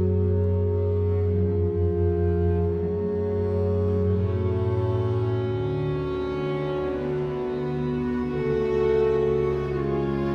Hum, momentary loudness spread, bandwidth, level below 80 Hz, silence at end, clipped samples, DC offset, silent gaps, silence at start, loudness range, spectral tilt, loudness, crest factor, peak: none; 5 LU; 5.6 kHz; -40 dBFS; 0 s; under 0.1%; under 0.1%; none; 0 s; 3 LU; -10 dB/octave; -25 LUFS; 12 dB; -12 dBFS